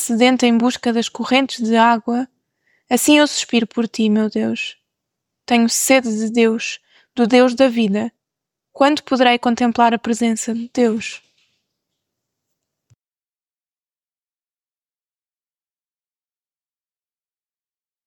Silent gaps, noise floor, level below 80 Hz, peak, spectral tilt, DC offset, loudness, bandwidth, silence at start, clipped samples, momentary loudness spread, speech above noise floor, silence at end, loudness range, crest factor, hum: none; under -90 dBFS; -66 dBFS; -2 dBFS; -3.5 dB/octave; under 0.1%; -16 LUFS; 17.5 kHz; 0 s; under 0.1%; 10 LU; over 74 dB; 6.9 s; 5 LU; 18 dB; none